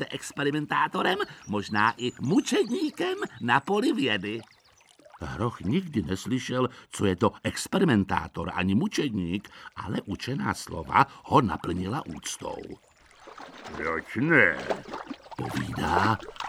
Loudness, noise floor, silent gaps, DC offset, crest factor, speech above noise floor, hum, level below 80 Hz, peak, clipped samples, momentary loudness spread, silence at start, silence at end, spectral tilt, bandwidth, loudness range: -27 LUFS; -59 dBFS; none; under 0.1%; 20 dB; 31 dB; none; -54 dBFS; -8 dBFS; under 0.1%; 13 LU; 0 s; 0 s; -5 dB/octave; 15.5 kHz; 3 LU